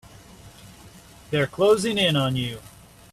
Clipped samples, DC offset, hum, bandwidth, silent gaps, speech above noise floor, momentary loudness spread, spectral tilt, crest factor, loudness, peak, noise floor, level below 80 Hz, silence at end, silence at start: under 0.1%; under 0.1%; none; 15 kHz; none; 26 dB; 11 LU; -5 dB/octave; 18 dB; -22 LUFS; -8 dBFS; -47 dBFS; -54 dBFS; 0.45 s; 0.45 s